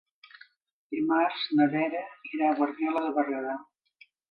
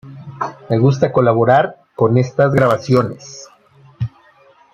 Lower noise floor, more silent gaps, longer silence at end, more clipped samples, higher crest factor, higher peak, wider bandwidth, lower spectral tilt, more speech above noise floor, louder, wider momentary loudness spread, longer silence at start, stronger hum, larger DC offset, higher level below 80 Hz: first, -61 dBFS vs -49 dBFS; neither; about the same, 0.7 s vs 0.65 s; neither; about the same, 18 dB vs 14 dB; second, -12 dBFS vs -2 dBFS; second, 5.4 kHz vs 7.6 kHz; about the same, -8 dB/octave vs -7.5 dB/octave; about the same, 34 dB vs 36 dB; second, -28 LUFS vs -15 LUFS; second, 12 LU vs 16 LU; first, 0.9 s vs 0.05 s; neither; neither; second, -80 dBFS vs -52 dBFS